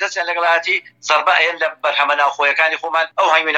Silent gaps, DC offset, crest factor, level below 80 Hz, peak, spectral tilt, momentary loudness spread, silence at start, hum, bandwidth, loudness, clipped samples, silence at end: none; under 0.1%; 16 dB; -80 dBFS; -2 dBFS; 0.5 dB/octave; 5 LU; 0 s; none; 13 kHz; -16 LUFS; under 0.1%; 0 s